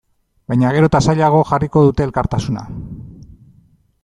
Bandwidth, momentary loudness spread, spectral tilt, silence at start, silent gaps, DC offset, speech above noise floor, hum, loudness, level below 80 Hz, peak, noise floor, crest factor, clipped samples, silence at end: 10.5 kHz; 17 LU; -7.5 dB/octave; 0.5 s; none; under 0.1%; 38 dB; none; -15 LUFS; -36 dBFS; -2 dBFS; -53 dBFS; 14 dB; under 0.1%; 0.9 s